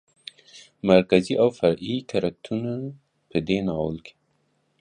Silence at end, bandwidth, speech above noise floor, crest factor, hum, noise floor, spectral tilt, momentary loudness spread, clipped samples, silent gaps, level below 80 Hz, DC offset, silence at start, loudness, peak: 0.7 s; 10 kHz; 46 dB; 22 dB; none; -69 dBFS; -7 dB/octave; 19 LU; under 0.1%; none; -54 dBFS; under 0.1%; 0.55 s; -24 LUFS; -2 dBFS